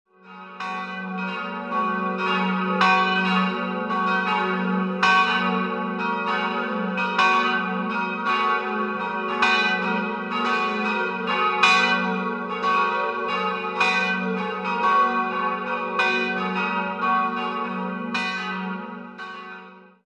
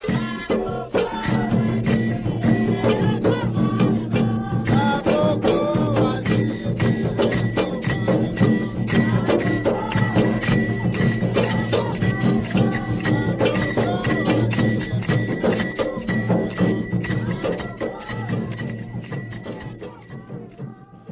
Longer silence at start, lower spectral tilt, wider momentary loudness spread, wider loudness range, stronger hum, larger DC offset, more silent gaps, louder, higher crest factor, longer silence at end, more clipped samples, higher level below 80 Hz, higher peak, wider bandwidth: first, 0.25 s vs 0 s; second, -5 dB/octave vs -11.5 dB/octave; about the same, 11 LU vs 10 LU; about the same, 3 LU vs 5 LU; neither; neither; neither; about the same, -22 LUFS vs -21 LUFS; first, 22 dB vs 16 dB; first, 0.25 s vs 0 s; neither; second, -66 dBFS vs -42 dBFS; about the same, -2 dBFS vs -4 dBFS; first, 10.5 kHz vs 4 kHz